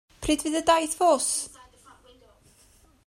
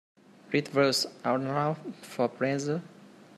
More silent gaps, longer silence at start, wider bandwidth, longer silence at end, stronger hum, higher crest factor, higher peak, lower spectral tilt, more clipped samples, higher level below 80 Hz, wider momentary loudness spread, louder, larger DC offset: neither; second, 0.2 s vs 0.5 s; first, 16 kHz vs 13.5 kHz; first, 1.6 s vs 0.3 s; neither; about the same, 20 dB vs 20 dB; about the same, -8 dBFS vs -10 dBFS; second, -2 dB/octave vs -4.5 dB/octave; neither; first, -52 dBFS vs -76 dBFS; about the same, 7 LU vs 9 LU; first, -24 LUFS vs -29 LUFS; neither